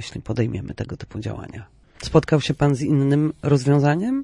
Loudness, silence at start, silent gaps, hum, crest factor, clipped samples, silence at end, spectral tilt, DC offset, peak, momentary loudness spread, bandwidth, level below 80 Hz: -21 LUFS; 0 s; none; none; 18 dB; under 0.1%; 0 s; -7.5 dB/octave; under 0.1%; -2 dBFS; 15 LU; 11 kHz; -46 dBFS